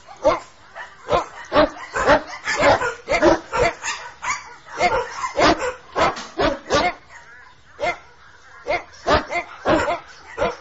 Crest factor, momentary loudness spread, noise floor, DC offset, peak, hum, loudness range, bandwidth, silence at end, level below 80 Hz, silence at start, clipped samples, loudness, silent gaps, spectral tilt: 18 dB; 12 LU; -48 dBFS; 0.3%; -4 dBFS; none; 5 LU; 8 kHz; 0 s; -40 dBFS; 0.1 s; under 0.1%; -21 LUFS; none; -4 dB/octave